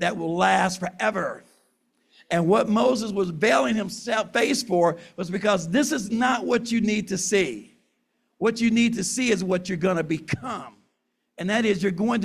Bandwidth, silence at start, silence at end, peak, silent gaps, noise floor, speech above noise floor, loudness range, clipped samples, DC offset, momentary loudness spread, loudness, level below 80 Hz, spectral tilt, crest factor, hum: 14.5 kHz; 0 s; 0 s; -8 dBFS; none; -75 dBFS; 52 dB; 2 LU; under 0.1%; under 0.1%; 9 LU; -23 LUFS; -60 dBFS; -4.5 dB/octave; 16 dB; none